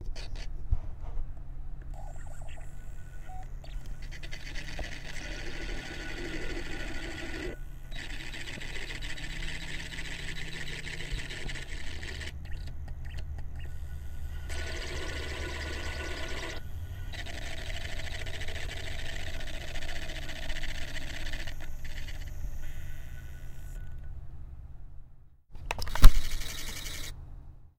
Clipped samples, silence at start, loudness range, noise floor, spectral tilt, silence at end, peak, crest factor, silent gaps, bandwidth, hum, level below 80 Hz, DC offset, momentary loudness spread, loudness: under 0.1%; 0 s; 11 LU; -51 dBFS; -4 dB/octave; 0.1 s; 0 dBFS; 30 dB; none; 15.5 kHz; none; -34 dBFS; under 0.1%; 10 LU; -39 LUFS